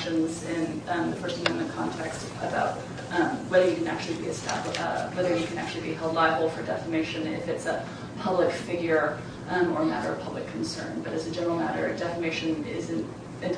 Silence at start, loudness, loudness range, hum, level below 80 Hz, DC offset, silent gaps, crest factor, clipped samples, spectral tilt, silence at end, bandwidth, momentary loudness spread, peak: 0 s; -29 LUFS; 2 LU; none; -58 dBFS; under 0.1%; none; 20 dB; under 0.1%; -5 dB/octave; 0 s; 10.5 kHz; 9 LU; -8 dBFS